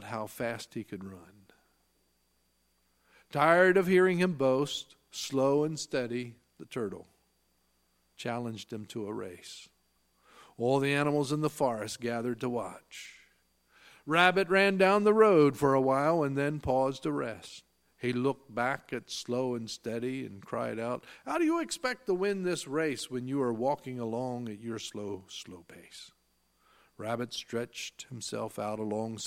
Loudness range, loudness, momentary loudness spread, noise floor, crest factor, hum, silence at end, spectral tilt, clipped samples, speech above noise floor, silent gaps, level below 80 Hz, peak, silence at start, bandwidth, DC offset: 15 LU; -30 LUFS; 19 LU; -73 dBFS; 24 dB; none; 0 s; -5 dB/octave; under 0.1%; 43 dB; none; -66 dBFS; -8 dBFS; 0 s; 16 kHz; under 0.1%